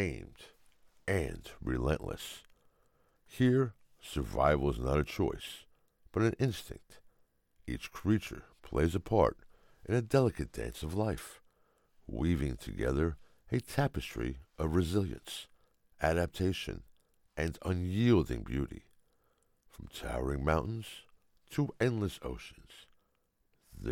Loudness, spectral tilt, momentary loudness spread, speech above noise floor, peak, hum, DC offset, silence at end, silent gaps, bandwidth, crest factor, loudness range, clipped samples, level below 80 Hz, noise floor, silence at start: -34 LUFS; -6.5 dB/octave; 19 LU; 43 dB; -12 dBFS; none; under 0.1%; 0 s; none; 17 kHz; 22 dB; 4 LU; under 0.1%; -46 dBFS; -76 dBFS; 0 s